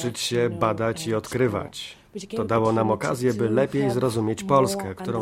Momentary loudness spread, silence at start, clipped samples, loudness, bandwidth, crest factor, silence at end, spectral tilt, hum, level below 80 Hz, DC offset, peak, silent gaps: 10 LU; 0 s; under 0.1%; -24 LUFS; 16 kHz; 18 dB; 0 s; -5.5 dB/octave; none; -56 dBFS; under 0.1%; -6 dBFS; none